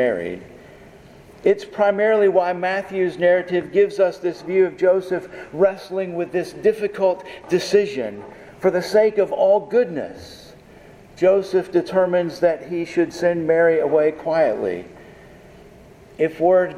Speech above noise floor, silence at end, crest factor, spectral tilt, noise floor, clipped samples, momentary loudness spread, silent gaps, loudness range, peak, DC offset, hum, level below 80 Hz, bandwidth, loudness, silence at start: 26 dB; 0 s; 16 dB; -6 dB/octave; -45 dBFS; under 0.1%; 11 LU; none; 3 LU; -4 dBFS; under 0.1%; none; -58 dBFS; 13 kHz; -20 LUFS; 0 s